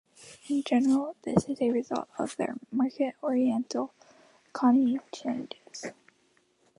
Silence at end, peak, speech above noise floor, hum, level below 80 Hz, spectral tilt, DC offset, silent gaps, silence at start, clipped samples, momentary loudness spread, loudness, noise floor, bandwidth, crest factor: 0.85 s; -8 dBFS; 40 dB; none; -66 dBFS; -6 dB/octave; under 0.1%; none; 0.2 s; under 0.1%; 16 LU; -29 LUFS; -68 dBFS; 11 kHz; 22 dB